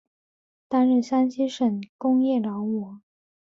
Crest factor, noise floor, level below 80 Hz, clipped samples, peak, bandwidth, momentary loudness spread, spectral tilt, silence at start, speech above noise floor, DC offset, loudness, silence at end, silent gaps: 14 dB; under -90 dBFS; -72 dBFS; under 0.1%; -10 dBFS; 7.4 kHz; 8 LU; -7 dB/octave; 0.7 s; over 67 dB; under 0.1%; -24 LUFS; 0.45 s; 1.89-1.99 s